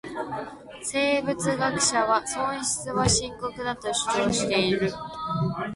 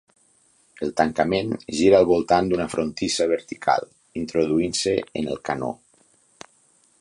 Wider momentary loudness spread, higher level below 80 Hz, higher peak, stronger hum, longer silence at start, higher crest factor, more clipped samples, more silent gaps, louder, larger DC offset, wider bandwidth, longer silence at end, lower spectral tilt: about the same, 11 LU vs 11 LU; about the same, -48 dBFS vs -52 dBFS; second, -8 dBFS vs -2 dBFS; neither; second, 0.05 s vs 0.8 s; about the same, 18 dB vs 20 dB; neither; neither; second, -25 LUFS vs -22 LUFS; neither; about the same, 11.5 kHz vs 11.5 kHz; second, 0 s vs 1.25 s; about the same, -3.5 dB/octave vs -4.5 dB/octave